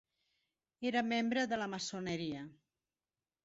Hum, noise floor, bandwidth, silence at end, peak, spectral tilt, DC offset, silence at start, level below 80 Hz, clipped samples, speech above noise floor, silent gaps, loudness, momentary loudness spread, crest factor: none; under -90 dBFS; 7.6 kHz; 0.9 s; -22 dBFS; -3 dB/octave; under 0.1%; 0.8 s; -76 dBFS; under 0.1%; over 53 dB; none; -37 LUFS; 10 LU; 18 dB